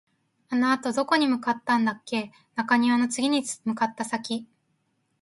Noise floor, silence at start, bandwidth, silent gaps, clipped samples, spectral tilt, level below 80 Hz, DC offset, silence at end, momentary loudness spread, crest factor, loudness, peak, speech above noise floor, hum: -72 dBFS; 0.5 s; 11.5 kHz; none; under 0.1%; -3.5 dB/octave; -74 dBFS; under 0.1%; 0.75 s; 9 LU; 20 dB; -25 LUFS; -6 dBFS; 47 dB; none